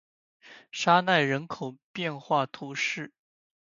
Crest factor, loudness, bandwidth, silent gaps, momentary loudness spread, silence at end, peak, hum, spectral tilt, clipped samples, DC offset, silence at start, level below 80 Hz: 24 dB; -27 LUFS; 7.6 kHz; 1.84-1.94 s; 16 LU; 0.7 s; -6 dBFS; none; -4.5 dB/octave; under 0.1%; under 0.1%; 0.45 s; -76 dBFS